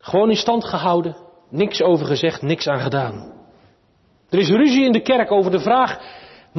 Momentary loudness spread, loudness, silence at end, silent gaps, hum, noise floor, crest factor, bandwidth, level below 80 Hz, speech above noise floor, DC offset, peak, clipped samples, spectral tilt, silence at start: 13 LU; -18 LUFS; 0 s; none; none; -58 dBFS; 14 dB; 6.2 kHz; -58 dBFS; 41 dB; under 0.1%; -6 dBFS; under 0.1%; -6 dB/octave; 0.05 s